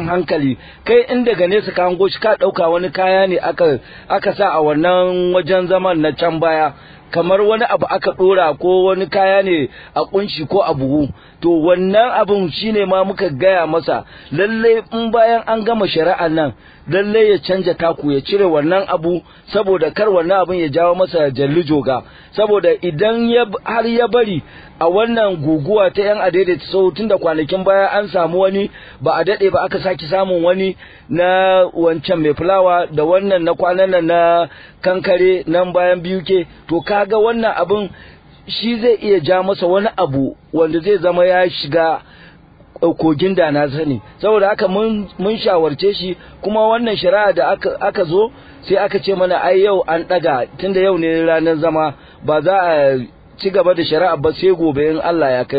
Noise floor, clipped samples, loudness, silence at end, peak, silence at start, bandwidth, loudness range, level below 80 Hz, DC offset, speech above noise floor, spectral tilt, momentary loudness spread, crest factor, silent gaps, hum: -43 dBFS; under 0.1%; -15 LUFS; 0 s; -2 dBFS; 0 s; 5 kHz; 2 LU; -48 dBFS; under 0.1%; 29 dB; -9.5 dB/octave; 7 LU; 14 dB; none; none